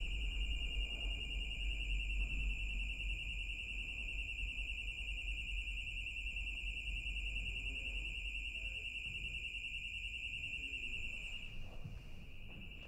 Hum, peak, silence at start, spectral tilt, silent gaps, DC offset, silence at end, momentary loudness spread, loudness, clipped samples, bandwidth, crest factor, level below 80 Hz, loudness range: none; -28 dBFS; 0 s; -3 dB/octave; none; under 0.1%; 0 s; 5 LU; -42 LUFS; under 0.1%; 9.2 kHz; 14 dB; -44 dBFS; 2 LU